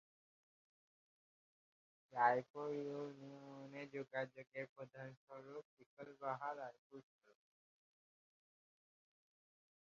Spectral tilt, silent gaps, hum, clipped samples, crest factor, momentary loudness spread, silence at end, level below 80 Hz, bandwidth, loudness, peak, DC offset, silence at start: -4.5 dB/octave; 2.50-2.54 s, 4.47-4.52 s, 4.69-4.76 s, 5.17-5.27 s, 5.65-5.77 s, 5.86-5.97 s, 6.78-6.90 s; none; under 0.1%; 28 dB; 21 LU; 2.9 s; under -90 dBFS; 7.2 kHz; -45 LUFS; -22 dBFS; under 0.1%; 2.1 s